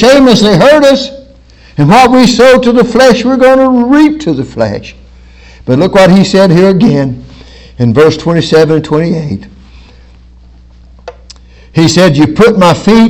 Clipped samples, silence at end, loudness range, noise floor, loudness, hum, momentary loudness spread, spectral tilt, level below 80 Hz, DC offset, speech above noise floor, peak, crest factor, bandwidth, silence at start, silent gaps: 10%; 0 s; 7 LU; -36 dBFS; -6 LUFS; none; 11 LU; -6 dB/octave; -34 dBFS; under 0.1%; 31 dB; 0 dBFS; 6 dB; 16.5 kHz; 0 s; none